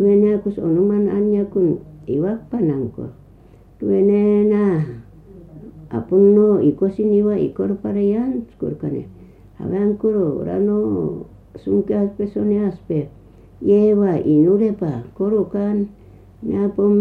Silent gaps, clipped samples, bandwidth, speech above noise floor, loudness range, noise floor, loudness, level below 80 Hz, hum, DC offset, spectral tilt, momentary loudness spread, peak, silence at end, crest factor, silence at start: none; under 0.1%; 3.5 kHz; 29 dB; 4 LU; -46 dBFS; -18 LUFS; -48 dBFS; none; under 0.1%; -11.5 dB/octave; 14 LU; -4 dBFS; 0 s; 14 dB; 0 s